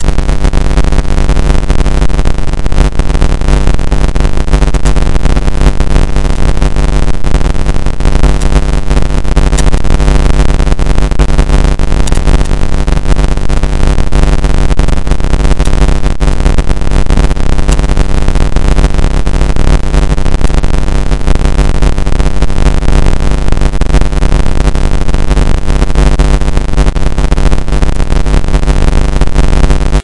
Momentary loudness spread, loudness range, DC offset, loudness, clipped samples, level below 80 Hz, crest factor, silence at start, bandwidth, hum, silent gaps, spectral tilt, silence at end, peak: 3 LU; 1 LU; under 0.1%; -12 LUFS; 0.3%; -8 dBFS; 6 dB; 0 s; 11 kHz; none; none; -6 dB/octave; 0 s; 0 dBFS